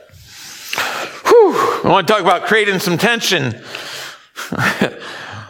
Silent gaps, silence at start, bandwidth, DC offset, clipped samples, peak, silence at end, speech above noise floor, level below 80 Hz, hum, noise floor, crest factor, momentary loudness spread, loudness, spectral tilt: none; 0.3 s; 18 kHz; under 0.1%; under 0.1%; 0 dBFS; 0 s; 23 dB; -56 dBFS; none; -38 dBFS; 16 dB; 18 LU; -14 LUFS; -4 dB/octave